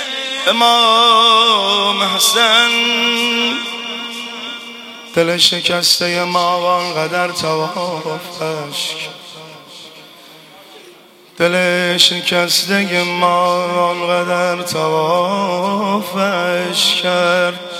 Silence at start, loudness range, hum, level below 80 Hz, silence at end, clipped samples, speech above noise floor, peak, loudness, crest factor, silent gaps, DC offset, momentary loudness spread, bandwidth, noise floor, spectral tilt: 0 s; 11 LU; none; -64 dBFS; 0 s; under 0.1%; 28 dB; 0 dBFS; -14 LUFS; 16 dB; none; under 0.1%; 15 LU; 16.5 kHz; -43 dBFS; -2.5 dB/octave